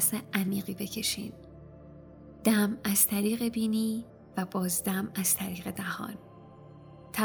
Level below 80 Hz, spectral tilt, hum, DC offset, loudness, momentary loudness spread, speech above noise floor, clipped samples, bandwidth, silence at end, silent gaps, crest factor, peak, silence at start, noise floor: -60 dBFS; -3.5 dB/octave; none; under 0.1%; -29 LUFS; 17 LU; 20 dB; under 0.1%; over 20 kHz; 0 s; none; 22 dB; -8 dBFS; 0 s; -50 dBFS